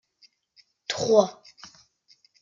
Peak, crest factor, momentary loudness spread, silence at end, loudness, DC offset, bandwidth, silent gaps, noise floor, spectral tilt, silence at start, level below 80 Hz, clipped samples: -6 dBFS; 22 dB; 27 LU; 1.1 s; -23 LUFS; under 0.1%; 7.6 kHz; none; -63 dBFS; -4 dB/octave; 0.9 s; -70 dBFS; under 0.1%